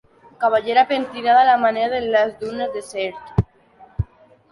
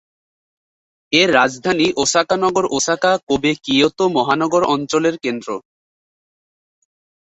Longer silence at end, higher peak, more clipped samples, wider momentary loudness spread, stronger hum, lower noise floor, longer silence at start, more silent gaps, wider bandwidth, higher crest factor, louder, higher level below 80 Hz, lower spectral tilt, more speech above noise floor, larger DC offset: second, 0.5 s vs 1.8 s; about the same, -2 dBFS vs 0 dBFS; neither; first, 15 LU vs 7 LU; neither; second, -50 dBFS vs under -90 dBFS; second, 0.4 s vs 1.1 s; second, none vs 3.23-3.27 s; first, 11.5 kHz vs 8.4 kHz; about the same, 18 dB vs 18 dB; second, -19 LUFS vs -16 LUFS; first, -40 dBFS vs -54 dBFS; first, -6 dB/octave vs -3 dB/octave; second, 31 dB vs over 74 dB; neither